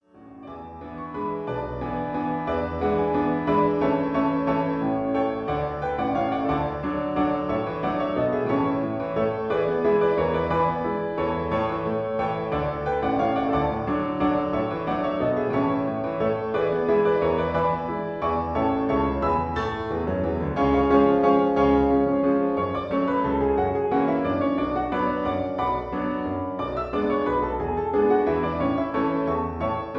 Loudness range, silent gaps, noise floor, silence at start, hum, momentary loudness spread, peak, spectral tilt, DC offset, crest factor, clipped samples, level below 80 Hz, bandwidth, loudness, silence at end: 4 LU; none; -44 dBFS; 0.15 s; none; 7 LU; -8 dBFS; -9 dB/octave; under 0.1%; 16 dB; under 0.1%; -42 dBFS; 6.2 kHz; -24 LUFS; 0 s